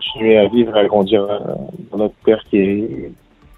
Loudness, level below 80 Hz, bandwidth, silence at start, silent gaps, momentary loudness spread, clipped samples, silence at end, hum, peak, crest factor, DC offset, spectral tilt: -15 LUFS; -48 dBFS; 4.1 kHz; 0 s; none; 15 LU; under 0.1%; 0.45 s; none; 0 dBFS; 16 dB; under 0.1%; -8.5 dB/octave